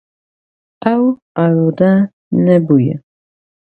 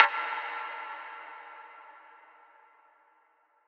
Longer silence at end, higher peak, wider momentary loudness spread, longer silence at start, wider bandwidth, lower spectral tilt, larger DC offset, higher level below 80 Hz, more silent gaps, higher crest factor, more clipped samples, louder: second, 0.7 s vs 1.5 s; about the same, 0 dBFS vs 0 dBFS; second, 7 LU vs 21 LU; first, 0.8 s vs 0 s; second, 4.5 kHz vs 6.8 kHz; first, -11 dB/octave vs 1 dB/octave; neither; first, -58 dBFS vs under -90 dBFS; first, 1.22-1.35 s, 2.13-2.31 s vs none; second, 14 dB vs 34 dB; neither; first, -14 LUFS vs -33 LUFS